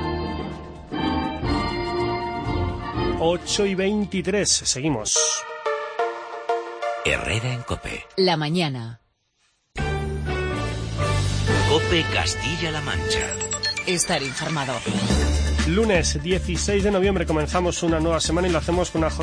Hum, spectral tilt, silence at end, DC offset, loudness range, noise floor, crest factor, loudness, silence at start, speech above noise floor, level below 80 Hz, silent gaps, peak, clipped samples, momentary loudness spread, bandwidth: none; -4 dB/octave; 0 s; under 0.1%; 4 LU; -67 dBFS; 18 dB; -23 LUFS; 0 s; 45 dB; -32 dBFS; none; -6 dBFS; under 0.1%; 8 LU; 10.5 kHz